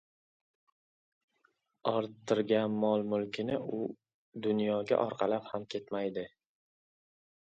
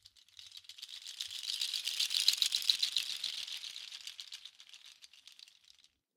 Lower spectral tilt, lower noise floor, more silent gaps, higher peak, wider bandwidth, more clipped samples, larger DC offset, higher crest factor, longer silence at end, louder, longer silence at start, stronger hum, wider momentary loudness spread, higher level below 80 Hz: first, -6.5 dB/octave vs 4.5 dB/octave; first, -75 dBFS vs -67 dBFS; first, 4.14-4.32 s vs none; second, -14 dBFS vs -8 dBFS; second, 8 kHz vs 18 kHz; neither; neither; second, 22 dB vs 30 dB; first, 1.2 s vs 0.85 s; about the same, -33 LUFS vs -34 LUFS; first, 1.85 s vs 0.15 s; neither; second, 9 LU vs 25 LU; first, -76 dBFS vs -90 dBFS